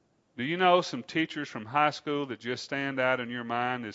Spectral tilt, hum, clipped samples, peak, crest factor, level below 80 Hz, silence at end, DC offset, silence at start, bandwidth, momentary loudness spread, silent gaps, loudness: -5 dB/octave; none; under 0.1%; -8 dBFS; 20 dB; -78 dBFS; 0 s; under 0.1%; 0.35 s; 8 kHz; 11 LU; none; -29 LUFS